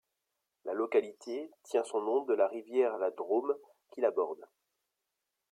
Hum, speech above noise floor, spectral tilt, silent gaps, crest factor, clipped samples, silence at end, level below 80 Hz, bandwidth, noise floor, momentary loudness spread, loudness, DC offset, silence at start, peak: none; 54 dB; -4.5 dB/octave; none; 18 dB; under 0.1%; 1.05 s; -88 dBFS; 11 kHz; -86 dBFS; 10 LU; -33 LUFS; under 0.1%; 0.65 s; -16 dBFS